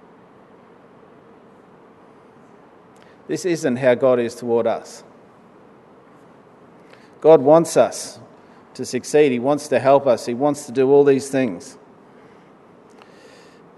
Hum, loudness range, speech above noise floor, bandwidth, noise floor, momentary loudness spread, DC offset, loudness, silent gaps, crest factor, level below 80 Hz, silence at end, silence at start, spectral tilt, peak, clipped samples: none; 7 LU; 31 dB; 12 kHz; -48 dBFS; 15 LU; under 0.1%; -18 LUFS; none; 20 dB; -72 dBFS; 2.05 s; 3.3 s; -5.5 dB/octave; 0 dBFS; under 0.1%